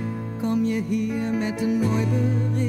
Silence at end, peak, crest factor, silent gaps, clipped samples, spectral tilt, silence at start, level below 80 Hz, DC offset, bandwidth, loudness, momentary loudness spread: 0 s; -10 dBFS; 12 dB; none; under 0.1%; -8 dB/octave; 0 s; -54 dBFS; under 0.1%; 13.5 kHz; -24 LUFS; 4 LU